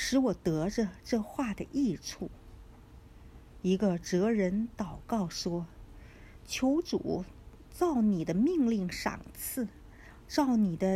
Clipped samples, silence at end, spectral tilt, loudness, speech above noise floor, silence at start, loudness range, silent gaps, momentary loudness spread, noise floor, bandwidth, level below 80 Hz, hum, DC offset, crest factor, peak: under 0.1%; 0 s; -5.5 dB/octave; -31 LUFS; 22 dB; 0 s; 4 LU; none; 11 LU; -53 dBFS; 15.5 kHz; -52 dBFS; none; under 0.1%; 16 dB; -16 dBFS